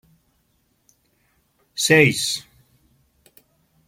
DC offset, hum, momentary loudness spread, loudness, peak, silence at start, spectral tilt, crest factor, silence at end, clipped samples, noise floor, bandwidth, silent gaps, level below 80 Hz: under 0.1%; none; 15 LU; -18 LUFS; -2 dBFS; 1.75 s; -3.5 dB/octave; 24 dB; 1.45 s; under 0.1%; -66 dBFS; 16.5 kHz; none; -62 dBFS